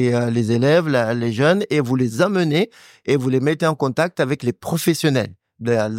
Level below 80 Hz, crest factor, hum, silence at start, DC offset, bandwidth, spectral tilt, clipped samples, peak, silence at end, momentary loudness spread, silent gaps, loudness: -60 dBFS; 14 dB; none; 0 s; under 0.1%; 16.5 kHz; -6 dB/octave; under 0.1%; -4 dBFS; 0 s; 6 LU; none; -19 LUFS